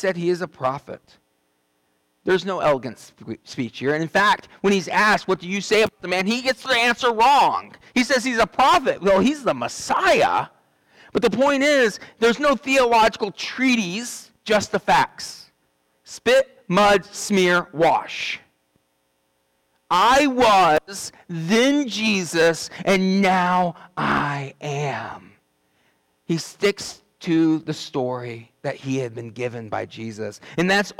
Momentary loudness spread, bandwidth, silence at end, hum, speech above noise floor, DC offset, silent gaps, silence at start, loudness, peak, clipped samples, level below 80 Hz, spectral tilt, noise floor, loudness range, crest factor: 15 LU; 18 kHz; 0.1 s; none; 48 dB; under 0.1%; none; 0 s; -20 LUFS; -10 dBFS; under 0.1%; -54 dBFS; -4 dB/octave; -68 dBFS; 7 LU; 12 dB